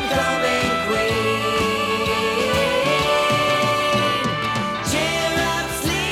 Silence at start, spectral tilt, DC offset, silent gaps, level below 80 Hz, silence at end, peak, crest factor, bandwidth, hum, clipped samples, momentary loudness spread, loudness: 0 s; -3.5 dB/octave; under 0.1%; none; -42 dBFS; 0 s; -6 dBFS; 14 dB; 17 kHz; none; under 0.1%; 4 LU; -19 LUFS